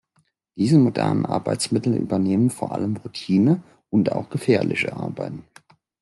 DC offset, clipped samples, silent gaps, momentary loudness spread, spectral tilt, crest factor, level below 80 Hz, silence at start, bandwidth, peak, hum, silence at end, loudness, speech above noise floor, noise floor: under 0.1%; under 0.1%; none; 12 LU; -6.5 dB/octave; 16 dB; -62 dBFS; 0.55 s; 12 kHz; -6 dBFS; none; 0.6 s; -22 LUFS; 46 dB; -67 dBFS